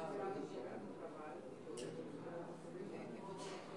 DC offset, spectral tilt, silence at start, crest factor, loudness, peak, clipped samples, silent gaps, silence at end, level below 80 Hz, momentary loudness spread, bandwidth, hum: under 0.1%; -5.5 dB/octave; 0 s; 16 dB; -49 LUFS; -34 dBFS; under 0.1%; none; 0 s; -84 dBFS; 6 LU; 11.5 kHz; none